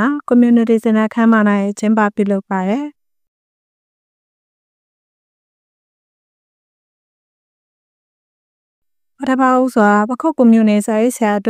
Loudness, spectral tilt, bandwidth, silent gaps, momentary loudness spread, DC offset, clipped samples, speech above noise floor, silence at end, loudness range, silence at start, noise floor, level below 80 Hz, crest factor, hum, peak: -14 LUFS; -6.5 dB/octave; 14 kHz; 3.28-8.82 s; 7 LU; under 0.1%; under 0.1%; over 77 dB; 0 s; 12 LU; 0 s; under -90 dBFS; -66 dBFS; 16 dB; none; 0 dBFS